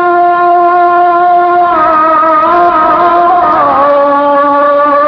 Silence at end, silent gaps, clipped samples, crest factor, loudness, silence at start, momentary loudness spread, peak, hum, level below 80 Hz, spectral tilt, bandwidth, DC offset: 0 s; none; 0.5%; 6 dB; -7 LUFS; 0 s; 1 LU; 0 dBFS; none; -44 dBFS; -7.5 dB/octave; 5.4 kHz; under 0.1%